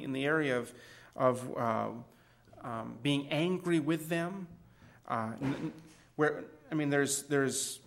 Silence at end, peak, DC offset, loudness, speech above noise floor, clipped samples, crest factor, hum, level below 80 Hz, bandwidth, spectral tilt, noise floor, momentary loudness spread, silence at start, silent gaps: 0.1 s; -14 dBFS; under 0.1%; -33 LUFS; 24 dB; under 0.1%; 20 dB; none; -70 dBFS; 16 kHz; -4.5 dB/octave; -57 dBFS; 16 LU; 0 s; none